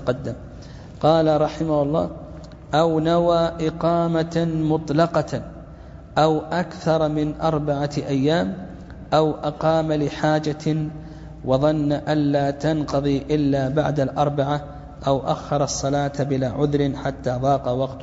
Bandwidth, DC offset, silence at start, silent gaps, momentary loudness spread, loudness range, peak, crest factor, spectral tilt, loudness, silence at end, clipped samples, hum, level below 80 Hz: 7.8 kHz; under 0.1%; 0 s; none; 13 LU; 2 LU; -4 dBFS; 18 dB; -6.5 dB/octave; -22 LUFS; 0 s; under 0.1%; none; -42 dBFS